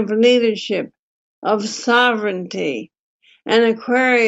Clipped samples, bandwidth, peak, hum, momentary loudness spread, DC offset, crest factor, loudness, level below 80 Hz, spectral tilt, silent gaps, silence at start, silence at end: under 0.1%; 8 kHz; -2 dBFS; none; 12 LU; under 0.1%; 16 dB; -17 LUFS; -72 dBFS; -4 dB/octave; 0.99-1.42 s, 2.99-3.20 s; 0 s; 0 s